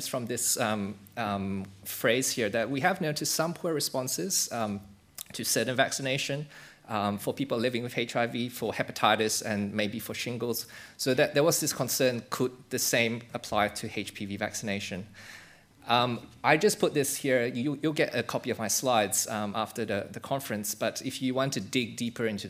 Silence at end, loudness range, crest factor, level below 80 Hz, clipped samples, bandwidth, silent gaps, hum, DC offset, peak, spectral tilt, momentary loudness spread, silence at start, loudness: 0 s; 3 LU; 22 dB; -68 dBFS; under 0.1%; 16 kHz; none; none; under 0.1%; -6 dBFS; -3.5 dB/octave; 10 LU; 0 s; -29 LUFS